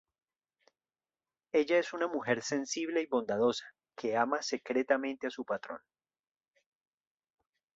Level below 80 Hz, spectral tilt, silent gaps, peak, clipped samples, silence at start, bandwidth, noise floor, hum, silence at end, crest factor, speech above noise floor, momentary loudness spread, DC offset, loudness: -78 dBFS; -3.5 dB/octave; none; -14 dBFS; under 0.1%; 1.55 s; 8 kHz; under -90 dBFS; none; 2 s; 22 dB; over 58 dB; 9 LU; under 0.1%; -33 LUFS